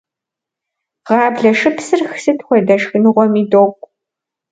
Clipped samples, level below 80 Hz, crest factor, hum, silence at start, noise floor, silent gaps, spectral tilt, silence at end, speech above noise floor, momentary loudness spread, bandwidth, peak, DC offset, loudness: under 0.1%; -62 dBFS; 14 dB; none; 1.05 s; -84 dBFS; none; -6 dB/octave; 0.8 s; 72 dB; 6 LU; 9.2 kHz; 0 dBFS; under 0.1%; -13 LUFS